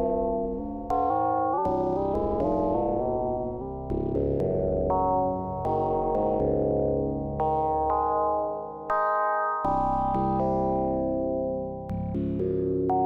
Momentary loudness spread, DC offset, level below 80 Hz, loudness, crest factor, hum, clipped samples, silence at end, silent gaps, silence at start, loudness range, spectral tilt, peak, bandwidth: 6 LU; under 0.1%; -42 dBFS; -27 LUFS; 10 dB; none; under 0.1%; 0 s; none; 0 s; 1 LU; -10.5 dB/octave; -16 dBFS; 6.2 kHz